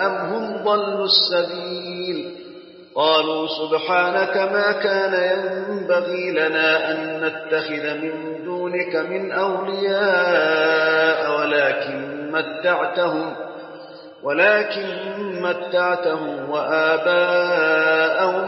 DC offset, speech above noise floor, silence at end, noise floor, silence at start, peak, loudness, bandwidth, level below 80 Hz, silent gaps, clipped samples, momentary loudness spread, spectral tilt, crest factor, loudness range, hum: under 0.1%; 21 dB; 0 s; -41 dBFS; 0 s; -4 dBFS; -20 LUFS; 6 kHz; -76 dBFS; none; under 0.1%; 11 LU; -7 dB/octave; 16 dB; 3 LU; none